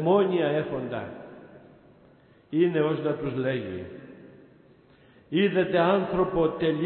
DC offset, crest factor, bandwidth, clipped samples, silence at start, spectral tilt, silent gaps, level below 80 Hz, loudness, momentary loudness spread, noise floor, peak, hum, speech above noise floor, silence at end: under 0.1%; 18 dB; 4.3 kHz; under 0.1%; 0 s; -11 dB/octave; none; -56 dBFS; -26 LUFS; 19 LU; -57 dBFS; -10 dBFS; none; 32 dB; 0 s